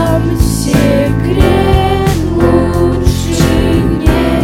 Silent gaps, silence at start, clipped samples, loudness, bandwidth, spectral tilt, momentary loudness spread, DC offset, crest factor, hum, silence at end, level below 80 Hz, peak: none; 0 s; 0.8%; -11 LUFS; 16.5 kHz; -6.5 dB/octave; 3 LU; under 0.1%; 10 dB; none; 0 s; -18 dBFS; 0 dBFS